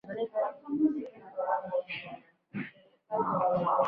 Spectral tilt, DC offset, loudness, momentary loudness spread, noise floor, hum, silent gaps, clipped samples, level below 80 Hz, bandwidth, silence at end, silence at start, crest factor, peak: -8.5 dB/octave; under 0.1%; -33 LUFS; 15 LU; -51 dBFS; none; none; under 0.1%; -74 dBFS; 5.2 kHz; 0 s; 0.05 s; 18 dB; -14 dBFS